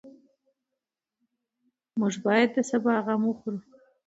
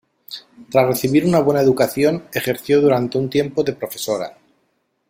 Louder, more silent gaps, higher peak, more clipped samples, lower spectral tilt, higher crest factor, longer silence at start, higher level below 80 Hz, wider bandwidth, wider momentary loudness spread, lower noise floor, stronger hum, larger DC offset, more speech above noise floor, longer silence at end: second, -26 LUFS vs -18 LUFS; neither; second, -8 dBFS vs -2 dBFS; neither; about the same, -5.5 dB/octave vs -6 dB/octave; first, 22 dB vs 16 dB; second, 0.05 s vs 0.3 s; second, -78 dBFS vs -54 dBFS; second, 8 kHz vs 16.5 kHz; second, 13 LU vs 16 LU; first, -87 dBFS vs -67 dBFS; neither; neither; first, 61 dB vs 49 dB; second, 0.45 s vs 0.8 s